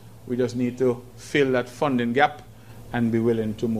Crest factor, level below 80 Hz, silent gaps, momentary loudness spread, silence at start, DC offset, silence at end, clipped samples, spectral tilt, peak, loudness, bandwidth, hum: 22 dB; -54 dBFS; none; 9 LU; 0 s; 0.3%; 0 s; under 0.1%; -6.5 dB/octave; -2 dBFS; -24 LUFS; 15 kHz; none